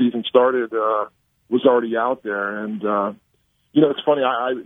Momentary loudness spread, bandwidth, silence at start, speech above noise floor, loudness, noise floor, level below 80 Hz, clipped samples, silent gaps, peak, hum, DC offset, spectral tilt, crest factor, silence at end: 8 LU; 3.9 kHz; 0 s; 46 dB; -20 LUFS; -65 dBFS; -70 dBFS; under 0.1%; none; 0 dBFS; none; under 0.1%; -8 dB/octave; 20 dB; 0 s